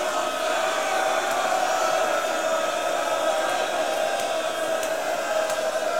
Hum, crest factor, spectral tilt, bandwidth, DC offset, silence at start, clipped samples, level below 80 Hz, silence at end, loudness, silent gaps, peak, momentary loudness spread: none; 16 dB; -1 dB/octave; 16.5 kHz; 0.5%; 0 s; under 0.1%; -68 dBFS; 0 s; -24 LUFS; none; -10 dBFS; 3 LU